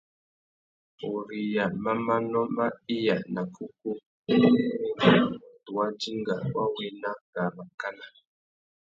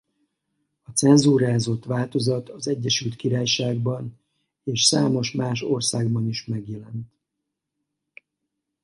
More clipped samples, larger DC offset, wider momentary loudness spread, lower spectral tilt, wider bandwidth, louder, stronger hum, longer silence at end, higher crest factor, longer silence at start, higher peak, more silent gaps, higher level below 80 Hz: neither; neither; about the same, 15 LU vs 15 LU; first, -7 dB/octave vs -4.5 dB/octave; second, 7.6 kHz vs 11.5 kHz; second, -28 LUFS vs -22 LUFS; neither; second, 0.75 s vs 1.8 s; about the same, 22 dB vs 20 dB; about the same, 1 s vs 0.9 s; about the same, -6 dBFS vs -4 dBFS; first, 4.06-4.24 s, 7.21-7.33 s, 7.74-7.78 s vs none; second, -66 dBFS vs -60 dBFS